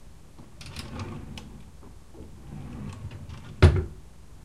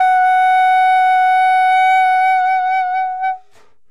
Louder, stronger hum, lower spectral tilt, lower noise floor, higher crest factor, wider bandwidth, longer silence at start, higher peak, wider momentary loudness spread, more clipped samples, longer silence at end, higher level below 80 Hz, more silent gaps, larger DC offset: second, -27 LUFS vs -13 LUFS; neither; first, -7 dB/octave vs 1.5 dB/octave; second, -49 dBFS vs -54 dBFS; first, 28 dB vs 8 dB; about the same, 11.5 kHz vs 11 kHz; about the same, 0.05 s vs 0 s; about the same, -2 dBFS vs -4 dBFS; first, 28 LU vs 8 LU; neither; second, 0 s vs 0.55 s; first, -36 dBFS vs -64 dBFS; neither; about the same, 0.4% vs 0.7%